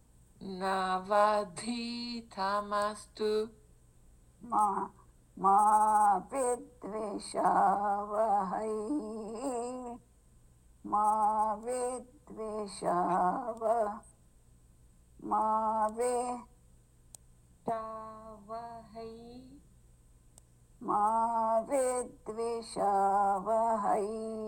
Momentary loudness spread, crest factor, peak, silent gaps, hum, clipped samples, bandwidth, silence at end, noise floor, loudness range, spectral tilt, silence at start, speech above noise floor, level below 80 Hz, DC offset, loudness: 17 LU; 18 dB; -14 dBFS; none; none; under 0.1%; 17 kHz; 0 s; -61 dBFS; 10 LU; -4.5 dB/octave; 0.4 s; 30 dB; -62 dBFS; under 0.1%; -32 LUFS